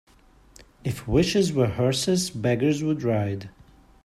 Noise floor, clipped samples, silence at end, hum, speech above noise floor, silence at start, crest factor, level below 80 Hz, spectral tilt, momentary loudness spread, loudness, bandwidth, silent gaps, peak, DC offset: -54 dBFS; under 0.1%; 0.55 s; none; 31 dB; 0.85 s; 18 dB; -46 dBFS; -5.5 dB/octave; 11 LU; -24 LUFS; 14.5 kHz; none; -8 dBFS; under 0.1%